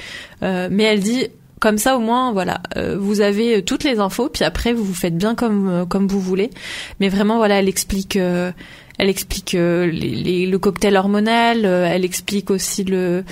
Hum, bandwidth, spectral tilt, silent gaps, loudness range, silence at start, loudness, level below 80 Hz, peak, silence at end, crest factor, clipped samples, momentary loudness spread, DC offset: none; 16 kHz; -5 dB/octave; none; 2 LU; 0 s; -18 LUFS; -40 dBFS; -2 dBFS; 0 s; 16 dB; under 0.1%; 7 LU; under 0.1%